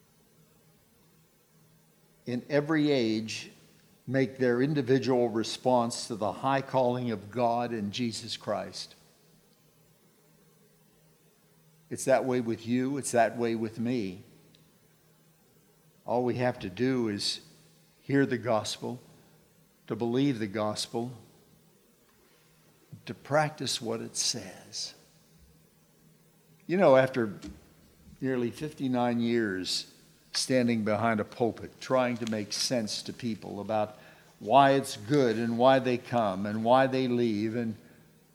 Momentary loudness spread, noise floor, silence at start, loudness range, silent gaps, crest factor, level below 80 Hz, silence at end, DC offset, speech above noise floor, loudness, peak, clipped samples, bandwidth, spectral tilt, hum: 14 LU; -63 dBFS; 2.25 s; 8 LU; none; 22 dB; -70 dBFS; 0.6 s; under 0.1%; 35 dB; -29 LUFS; -8 dBFS; under 0.1%; 18 kHz; -5 dB/octave; none